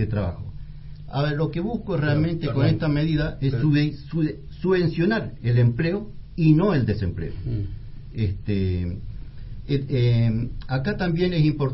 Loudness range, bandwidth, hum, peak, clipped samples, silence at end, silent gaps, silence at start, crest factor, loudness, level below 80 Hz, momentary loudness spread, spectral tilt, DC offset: 4 LU; 5.8 kHz; none; -6 dBFS; under 0.1%; 0 s; none; 0 s; 18 dB; -23 LUFS; -38 dBFS; 16 LU; -12 dB/octave; under 0.1%